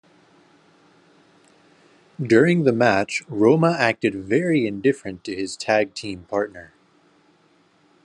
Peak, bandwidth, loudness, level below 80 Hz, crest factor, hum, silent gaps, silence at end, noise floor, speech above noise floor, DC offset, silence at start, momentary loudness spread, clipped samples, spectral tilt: -2 dBFS; 10.5 kHz; -21 LUFS; -68 dBFS; 20 dB; none; none; 1.4 s; -59 dBFS; 39 dB; under 0.1%; 2.2 s; 13 LU; under 0.1%; -6 dB/octave